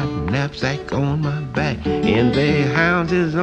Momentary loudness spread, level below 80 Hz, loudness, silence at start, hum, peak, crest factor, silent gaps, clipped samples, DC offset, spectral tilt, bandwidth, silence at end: 6 LU; -38 dBFS; -19 LUFS; 0 s; none; -2 dBFS; 16 dB; none; under 0.1%; under 0.1%; -7 dB/octave; 8.4 kHz; 0 s